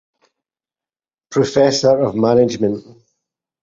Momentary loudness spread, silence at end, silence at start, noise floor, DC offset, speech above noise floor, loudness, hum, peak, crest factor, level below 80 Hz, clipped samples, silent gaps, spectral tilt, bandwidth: 8 LU; 0.8 s; 1.3 s; under -90 dBFS; under 0.1%; over 75 dB; -15 LUFS; none; 0 dBFS; 18 dB; -54 dBFS; under 0.1%; none; -5.5 dB/octave; 7.8 kHz